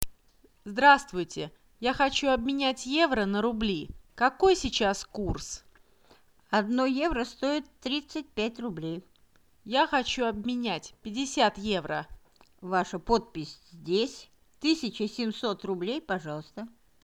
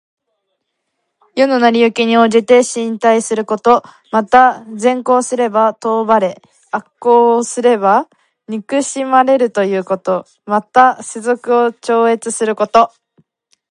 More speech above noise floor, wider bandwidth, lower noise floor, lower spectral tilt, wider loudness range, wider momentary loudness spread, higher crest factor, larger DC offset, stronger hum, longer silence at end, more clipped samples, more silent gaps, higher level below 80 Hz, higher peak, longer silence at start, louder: second, 37 dB vs 59 dB; first, over 20 kHz vs 11.5 kHz; second, -65 dBFS vs -71 dBFS; about the same, -4 dB/octave vs -4 dB/octave; first, 5 LU vs 2 LU; first, 16 LU vs 8 LU; first, 28 dB vs 14 dB; neither; neither; second, 0.35 s vs 0.85 s; neither; neither; first, -50 dBFS vs -62 dBFS; about the same, -2 dBFS vs 0 dBFS; second, 0 s vs 1.35 s; second, -28 LUFS vs -13 LUFS